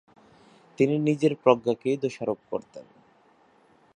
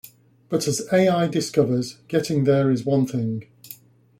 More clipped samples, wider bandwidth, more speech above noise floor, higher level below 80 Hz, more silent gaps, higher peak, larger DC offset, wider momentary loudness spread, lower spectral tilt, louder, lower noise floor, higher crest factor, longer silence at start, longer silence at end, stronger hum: neither; second, 10 kHz vs 16.5 kHz; first, 36 dB vs 25 dB; second, -70 dBFS vs -60 dBFS; neither; about the same, -4 dBFS vs -4 dBFS; neither; second, 13 LU vs 18 LU; about the same, -7 dB/octave vs -6 dB/octave; second, -25 LUFS vs -22 LUFS; first, -60 dBFS vs -46 dBFS; first, 24 dB vs 18 dB; first, 0.8 s vs 0.05 s; first, 1.15 s vs 0.45 s; neither